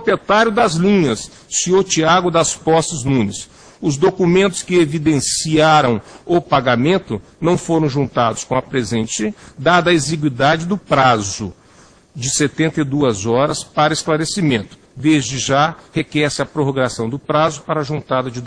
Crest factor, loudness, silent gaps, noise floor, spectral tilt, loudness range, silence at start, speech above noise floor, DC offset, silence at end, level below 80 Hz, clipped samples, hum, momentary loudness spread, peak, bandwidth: 16 dB; -16 LUFS; none; -47 dBFS; -4.5 dB/octave; 3 LU; 0 s; 31 dB; under 0.1%; 0 s; -46 dBFS; under 0.1%; none; 8 LU; 0 dBFS; 10.5 kHz